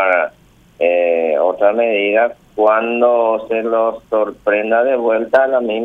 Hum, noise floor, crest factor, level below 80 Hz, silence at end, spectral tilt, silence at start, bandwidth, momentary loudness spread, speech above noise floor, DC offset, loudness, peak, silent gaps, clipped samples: none; -48 dBFS; 14 dB; -58 dBFS; 0 s; -6 dB/octave; 0 s; 4.3 kHz; 5 LU; 33 dB; under 0.1%; -15 LUFS; 0 dBFS; none; under 0.1%